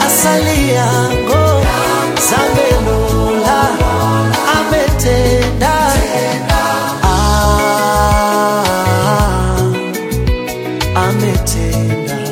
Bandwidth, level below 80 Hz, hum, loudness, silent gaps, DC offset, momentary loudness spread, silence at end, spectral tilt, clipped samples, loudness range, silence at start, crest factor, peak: 17 kHz; -20 dBFS; none; -13 LUFS; none; under 0.1%; 5 LU; 0 s; -4.5 dB/octave; under 0.1%; 2 LU; 0 s; 12 dB; 0 dBFS